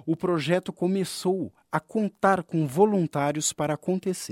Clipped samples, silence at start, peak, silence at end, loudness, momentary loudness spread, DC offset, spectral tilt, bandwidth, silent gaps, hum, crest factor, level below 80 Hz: under 0.1%; 0.05 s; -6 dBFS; 0.05 s; -26 LUFS; 7 LU; under 0.1%; -5 dB/octave; 16.5 kHz; none; none; 20 dB; -66 dBFS